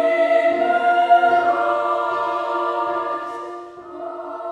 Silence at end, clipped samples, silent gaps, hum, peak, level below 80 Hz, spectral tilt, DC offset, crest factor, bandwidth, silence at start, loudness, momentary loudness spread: 0 s; under 0.1%; none; none; -4 dBFS; -68 dBFS; -4.5 dB/octave; under 0.1%; 16 dB; 8.8 kHz; 0 s; -18 LUFS; 17 LU